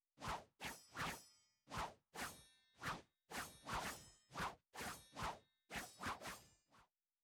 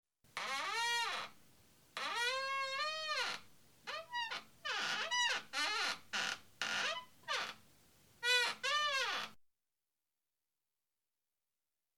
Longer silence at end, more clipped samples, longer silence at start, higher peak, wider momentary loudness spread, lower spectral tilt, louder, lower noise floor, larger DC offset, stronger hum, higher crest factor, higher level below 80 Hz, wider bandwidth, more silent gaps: second, 0.4 s vs 2.65 s; neither; about the same, 0.2 s vs 0.25 s; second, -36 dBFS vs -22 dBFS; second, 9 LU vs 12 LU; first, -3 dB/octave vs 1 dB/octave; second, -50 LUFS vs -37 LUFS; second, -75 dBFS vs under -90 dBFS; neither; neither; about the same, 16 dB vs 20 dB; first, -66 dBFS vs -84 dBFS; about the same, over 20 kHz vs over 20 kHz; neither